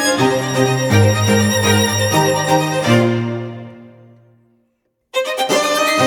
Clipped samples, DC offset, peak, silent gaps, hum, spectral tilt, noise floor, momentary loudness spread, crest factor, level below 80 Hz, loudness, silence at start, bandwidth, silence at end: under 0.1%; under 0.1%; 0 dBFS; none; none; -4.5 dB/octave; -67 dBFS; 10 LU; 16 dB; -52 dBFS; -15 LUFS; 0 s; 19 kHz; 0 s